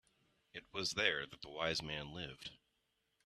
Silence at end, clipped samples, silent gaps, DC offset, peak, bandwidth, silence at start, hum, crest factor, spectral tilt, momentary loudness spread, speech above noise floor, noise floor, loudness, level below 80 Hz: 0.7 s; under 0.1%; none; under 0.1%; -18 dBFS; 13 kHz; 0.55 s; none; 26 dB; -2.5 dB/octave; 17 LU; 41 dB; -83 dBFS; -40 LUFS; -68 dBFS